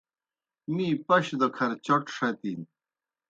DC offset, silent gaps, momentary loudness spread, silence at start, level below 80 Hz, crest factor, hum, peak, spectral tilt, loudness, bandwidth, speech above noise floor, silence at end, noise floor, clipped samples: under 0.1%; none; 12 LU; 0.7 s; -74 dBFS; 20 dB; none; -10 dBFS; -6 dB/octave; -27 LUFS; 9 kHz; over 63 dB; 0.65 s; under -90 dBFS; under 0.1%